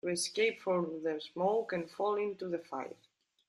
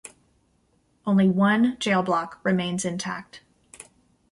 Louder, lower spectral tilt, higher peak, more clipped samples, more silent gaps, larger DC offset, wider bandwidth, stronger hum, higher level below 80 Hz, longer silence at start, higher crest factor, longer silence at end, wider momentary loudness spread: second, -35 LUFS vs -23 LUFS; second, -4 dB/octave vs -5.5 dB/octave; second, -18 dBFS vs -8 dBFS; neither; neither; neither; about the same, 12.5 kHz vs 11.5 kHz; neither; second, -82 dBFS vs -64 dBFS; second, 0.05 s vs 1.05 s; about the same, 16 dB vs 16 dB; about the same, 0.55 s vs 0.5 s; second, 9 LU vs 12 LU